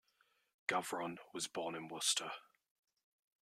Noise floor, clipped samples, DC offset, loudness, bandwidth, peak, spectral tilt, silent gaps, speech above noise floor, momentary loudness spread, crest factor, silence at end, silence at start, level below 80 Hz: -78 dBFS; under 0.1%; under 0.1%; -40 LUFS; 16 kHz; -20 dBFS; -1 dB/octave; none; 36 dB; 10 LU; 24 dB; 1 s; 0.7 s; -88 dBFS